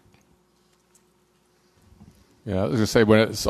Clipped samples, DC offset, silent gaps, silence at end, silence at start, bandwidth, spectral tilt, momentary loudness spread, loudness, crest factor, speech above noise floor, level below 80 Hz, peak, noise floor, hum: under 0.1%; under 0.1%; none; 0 s; 2.45 s; 14 kHz; -5.5 dB/octave; 14 LU; -21 LUFS; 20 dB; 44 dB; -48 dBFS; -4 dBFS; -63 dBFS; none